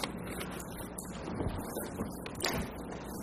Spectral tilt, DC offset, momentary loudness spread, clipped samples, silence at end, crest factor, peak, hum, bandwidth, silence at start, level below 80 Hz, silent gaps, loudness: -4.5 dB/octave; under 0.1%; 7 LU; under 0.1%; 0 s; 28 dB; -12 dBFS; none; 15.5 kHz; 0 s; -50 dBFS; none; -39 LUFS